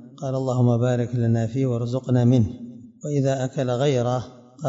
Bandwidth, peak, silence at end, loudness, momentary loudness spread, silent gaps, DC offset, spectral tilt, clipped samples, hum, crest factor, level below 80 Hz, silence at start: 7.8 kHz; -6 dBFS; 0 s; -22 LUFS; 9 LU; none; under 0.1%; -8 dB/octave; under 0.1%; none; 16 dB; -56 dBFS; 0 s